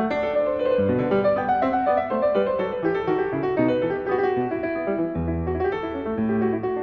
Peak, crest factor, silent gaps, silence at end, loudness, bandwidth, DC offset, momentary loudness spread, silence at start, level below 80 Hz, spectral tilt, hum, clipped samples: -8 dBFS; 14 dB; none; 0 s; -23 LUFS; 5.8 kHz; under 0.1%; 5 LU; 0 s; -46 dBFS; -9 dB/octave; none; under 0.1%